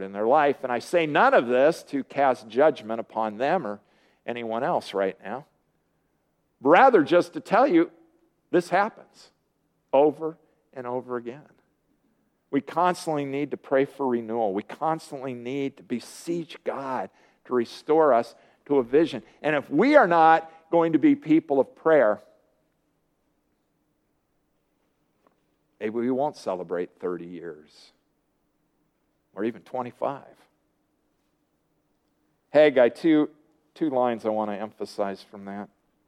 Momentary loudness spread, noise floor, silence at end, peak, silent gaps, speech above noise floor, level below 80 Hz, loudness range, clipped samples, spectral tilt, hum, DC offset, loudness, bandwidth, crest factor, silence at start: 16 LU; -72 dBFS; 0.4 s; -2 dBFS; none; 48 dB; -76 dBFS; 15 LU; under 0.1%; -6 dB/octave; none; under 0.1%; -24 LUFS; 13 kHz; 24 dB; 0 s